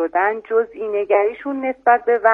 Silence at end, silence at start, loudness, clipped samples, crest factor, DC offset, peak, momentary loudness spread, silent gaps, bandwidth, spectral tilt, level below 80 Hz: 0 s; 0 s; -19 LUFS; under 0.1%; 16 dB; under 0.1%; -2 dBFS; 8 LU; none; 3.7 kHz; -6.5 dB/octave; -62 dBFS